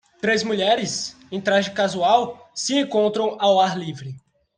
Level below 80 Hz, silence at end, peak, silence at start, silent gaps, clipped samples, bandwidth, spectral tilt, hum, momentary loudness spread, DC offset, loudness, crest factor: -66 dBFS; 0.4 s; -4 dBFS; 0.25 s; none; under 0.1%; 10 kHz; -3.5 dB/octave; none; 12 LU; under 0.1%; -21 LUFS; 18 dB